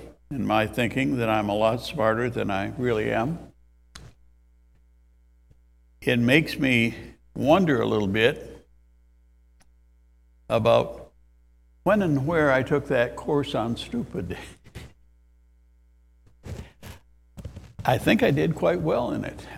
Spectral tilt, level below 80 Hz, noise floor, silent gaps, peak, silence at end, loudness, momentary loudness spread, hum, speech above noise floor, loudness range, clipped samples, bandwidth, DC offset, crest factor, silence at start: -6.5 dB/octave; -50 dBFS; -58 dBFS; none; -2 dBFS; 0 s; -24 LUFS; 21 LU; none; 35 dB; 11 LU; under 0.1%; 16 kHz; under 0.1%; 24 dB; 0 s